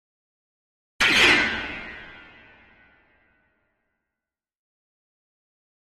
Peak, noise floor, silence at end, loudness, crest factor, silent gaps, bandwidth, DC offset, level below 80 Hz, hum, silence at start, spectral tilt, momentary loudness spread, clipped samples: -4 dBFS; -88 dBFS; 3.85 s; -18 LUFS; 26 dB; none; 13.5 kHz; under 0.1%; -54 dBFS; none; 1 s; -1.5 dB/octave; 23 LU; under 0.1%